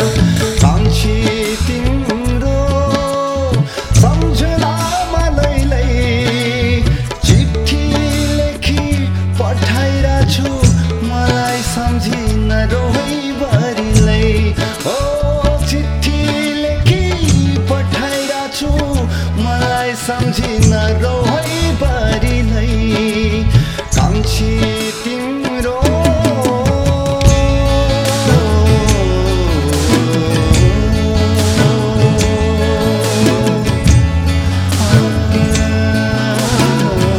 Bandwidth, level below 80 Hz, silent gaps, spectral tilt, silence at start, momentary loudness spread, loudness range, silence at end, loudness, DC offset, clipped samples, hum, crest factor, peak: 16.5 kHz; -20 dBFS; none; -5.5 dB/octave; 0 s; 5 LU; 2 LU; 0 s; -14 LUFS; under 0.1%; 0.2%; none; 12 dB; 0 dBFS